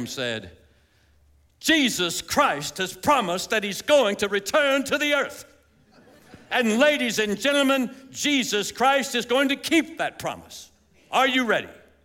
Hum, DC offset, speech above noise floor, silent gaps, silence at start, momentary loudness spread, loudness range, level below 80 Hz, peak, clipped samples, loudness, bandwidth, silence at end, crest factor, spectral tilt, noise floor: none; under 0.1%; 37 dB; none; 0 s; 10 LU; 2 LU; -60 dBFS; -6 dBFS; under 0.1%; -22 LUFS; 17 kHz; 0.3 s; 18 dB; -2.5 dB/octave; -60 dBFS